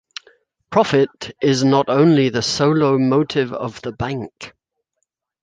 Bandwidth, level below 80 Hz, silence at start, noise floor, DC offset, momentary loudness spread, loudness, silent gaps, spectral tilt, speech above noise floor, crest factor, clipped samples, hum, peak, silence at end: 9.6 kHz; -52 dBFS; 0.7 s; -75 dBFS; under 0.1%; 18 LU; -17 LUFS; none; -6 dB/octave; 58 dB; 16 dB; under 0.1%; none; -2 dBFS; 0.95 s